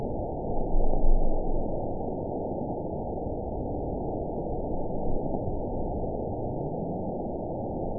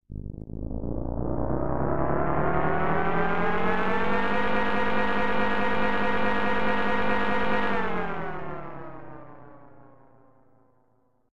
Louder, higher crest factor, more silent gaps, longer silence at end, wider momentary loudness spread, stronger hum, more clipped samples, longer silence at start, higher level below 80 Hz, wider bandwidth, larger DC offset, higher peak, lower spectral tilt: second, -32 LUFS vs -27 LUFS; about the same, 16 dB vs 18 dB; neither; about the same, 0 s vs 0.05 s; second, 3 LU vs 13 LU; neither; neither; about the same, 0 s vs 0 s; first, -30 dBFS vs -42 dBFS; second, 1 kHz vs 9 kHz; second, 0.6% vs 5%; about the same, -10 dBFS vs -8 dBFS; first, -16.5 dB/octave vs -7.5 dB/octave